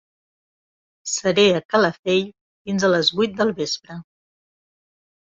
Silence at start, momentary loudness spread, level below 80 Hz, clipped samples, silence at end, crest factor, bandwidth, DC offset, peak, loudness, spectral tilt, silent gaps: 1.05 s; 18 LU; -62 dBFS; under 0.1%; 1.2 s; 18 dB; 8.2 kHz; under 0.1%; -4 dBFS; -20 LUFS; -4 dB/octave; 1.65-1.69 s, 1.99-2.03 s, 2.41-2.65 s